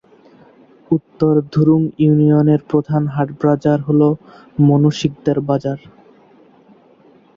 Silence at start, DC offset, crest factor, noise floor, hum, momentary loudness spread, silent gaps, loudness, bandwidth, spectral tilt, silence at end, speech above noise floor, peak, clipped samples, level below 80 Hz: 0.9 s; under 0.1%; 14 dB; -49 dBFS; none; 8 LU; none; -16 LUFS; 7.4 kHz; -9 dB/octave; 1.6 s; 34 dB; -2 dBFS; under 0.1%; -52 dBFS